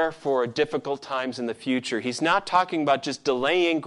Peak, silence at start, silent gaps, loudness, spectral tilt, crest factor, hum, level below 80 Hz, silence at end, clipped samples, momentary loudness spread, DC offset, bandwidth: -6 dBFS; 0 s; none; -25 LUFS; -4 dB/octave; 18 dB; none; -68 dBFS; 0 s; under 0.1%; 8 LU; under 0.1%; 11.5 kHz